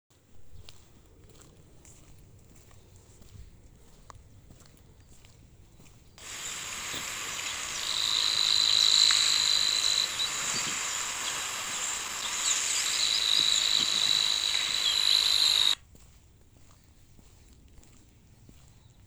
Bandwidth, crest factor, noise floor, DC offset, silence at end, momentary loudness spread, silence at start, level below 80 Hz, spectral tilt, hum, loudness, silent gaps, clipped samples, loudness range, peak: over 20 kHz; 22 dB; -57 dBFS; under 0.1%; 3.3 s; 13 LU; 0.35 s; -60 dBFS; 1.5 dB/octave; none; -25 LUFS; none; under 0.1%; 14 LU; -8 dBFS